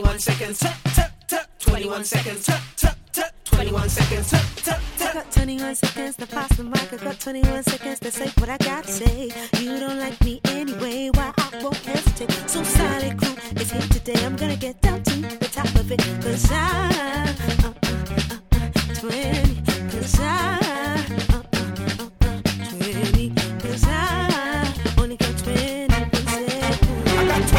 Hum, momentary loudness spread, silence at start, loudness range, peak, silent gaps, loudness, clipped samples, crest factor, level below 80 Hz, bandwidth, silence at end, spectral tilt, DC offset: none; 6 LU; 0 s; 2 LU; -2 dBFS; none; -22 LUFS; under 0.1%; 18 dB; -26 dBFS; 17.5 kHz; 0 s; -4.5 dB/octave; under 0.1%